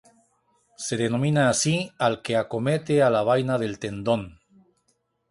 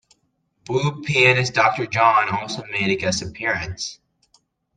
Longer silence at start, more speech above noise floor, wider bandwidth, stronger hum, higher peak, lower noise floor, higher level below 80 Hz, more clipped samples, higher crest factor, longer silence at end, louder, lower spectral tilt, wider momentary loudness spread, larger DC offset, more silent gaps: about the same, 0.8 s vs 0.7 s; about the same, 48 dB vs 49 dB; first, 11.5 kHz vs 9.8 kHz; neither; second, -6 dBFS vs -2 dBFS; about the same, -71 dBFS vs -69 dBFS; about the same, -58 dBFS vs -54 dBFS; neither; about the same, 18 dB vs 20 dB; first, 1 s vs 0.85 s; second, -24 LUFS vs -19 LUFS; about the same, -5 dB/octave vs -4 dB/octave; about the same, 10 LU vs 11 LU; neither; neither